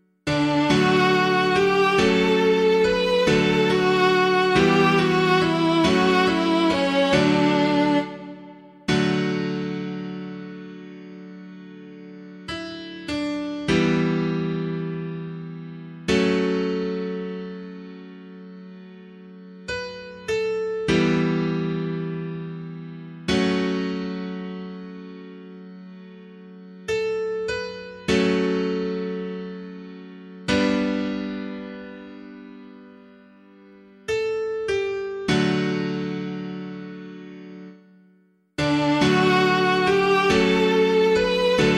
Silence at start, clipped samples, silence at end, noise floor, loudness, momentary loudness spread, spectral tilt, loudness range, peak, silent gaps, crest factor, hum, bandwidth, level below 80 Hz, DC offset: 0.25 s; under 0.1%; 0 s; -60 dBFS; -22 LUFS; 22 LU; -5.5 dB/octave; 14 LU; -6 dBFS; none; 18 dB; none; 12.5 kHz; -50 dBFS; under 0.1%